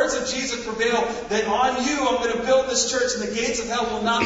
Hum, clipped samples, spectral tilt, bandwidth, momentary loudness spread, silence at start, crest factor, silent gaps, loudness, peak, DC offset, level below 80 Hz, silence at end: none; under 0.1%; -2 dB/octave; 8 kHz; 4 LU; 0 s; 16 dB; none; -22 LUFS; -6 dBFS; under 0.1%; -48 dBFS; 0 s